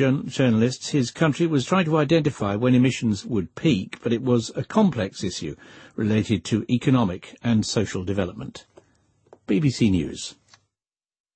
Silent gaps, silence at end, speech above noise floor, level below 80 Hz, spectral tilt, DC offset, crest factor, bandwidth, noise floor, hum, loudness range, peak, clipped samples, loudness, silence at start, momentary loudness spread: none; 1.05 s; over 68 dB; -52 dBFS; -6 dB/octave; under 0.1%; 16 dB; 8.8 kHz; under -90 dBFS; none; 4 LU; -6 dBFS; under 0.1%; -23 LUFS; 0 s; 10 LU